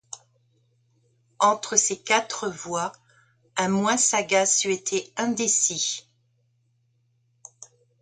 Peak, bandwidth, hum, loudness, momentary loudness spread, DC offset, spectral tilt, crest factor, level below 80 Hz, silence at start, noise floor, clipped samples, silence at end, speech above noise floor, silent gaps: -2 dBFS; 10.5 kHz; none; -23 LUFS; 13 LU; under 0.1%; -2 dB/octave; 24 dB; -70 dBFS; 0.15 s; -68 dBFS; under 0.1%; 0.35 s; 44 dB; none